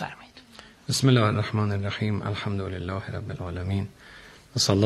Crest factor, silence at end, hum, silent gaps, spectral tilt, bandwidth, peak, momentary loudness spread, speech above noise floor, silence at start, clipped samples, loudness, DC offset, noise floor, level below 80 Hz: 22 dB; 0 s; none; none; -5 dB/octave; 13 kHz; -6 dBFS; 25 LU; 24 dB; 0 s; under 0.1%; -27 LUFS; under 0.1%; -49 dBFS; -58 dBFS